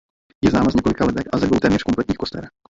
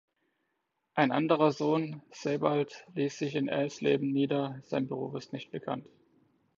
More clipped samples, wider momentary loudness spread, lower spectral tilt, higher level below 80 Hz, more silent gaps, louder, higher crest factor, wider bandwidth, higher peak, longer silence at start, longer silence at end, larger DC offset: neither; second, 8 LU vs 12 LU; about the same, -6.5 dB/octave vs -6.5 dB/octave; first, -40 dBFS vs -76 dBFS; neither; first, -19 LUFS vs -31 LUFS; second, 16 dB vs 22 dB; about the same, 7.8 kHz vs 7.6 kHz; first, -4 dBFS vs -10 dBFS; second, 0.45 s vs 0.95 s; second, 0.3 s vs 0.75 s; neither